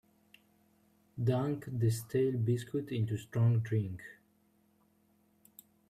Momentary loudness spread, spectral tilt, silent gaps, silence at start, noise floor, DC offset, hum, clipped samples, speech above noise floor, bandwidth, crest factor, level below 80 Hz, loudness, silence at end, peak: 11 LU; -7.5 dB/octave; none; 1.15 s; -71 dBFS; under 0.1%; none; under 0.1%; 39 dB; 14 kHz; 16 dB; -70 dBFS; -33 LUFS; 1.75 s; -18 dBFS